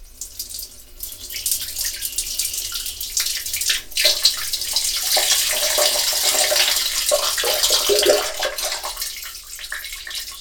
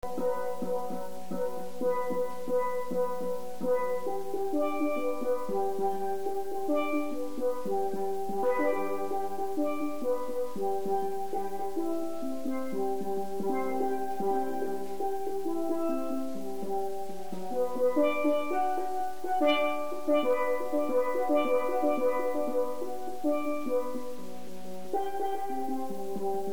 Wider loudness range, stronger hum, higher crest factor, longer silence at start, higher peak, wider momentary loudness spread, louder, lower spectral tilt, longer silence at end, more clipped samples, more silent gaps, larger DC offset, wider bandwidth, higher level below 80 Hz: about the same, 6 LU vs 5 LU; neither; about the same, 20 dB vs 16 dB; about the same, 0 s vs 0 s; first, 0 dBFS vs -14 dBFS; first, 15 LU vs 8 LU; first, -18 LUFS vs -32 LUFS; second, 1 dB/octave vs -5.5 dB/octave; about the same, 0 s vs 0 s; neither; neither; second, under 0.1% vs 2%; about the same, 19.5 kHz vs over 20 kHz; first, -46 dBFS vs -66 dBFS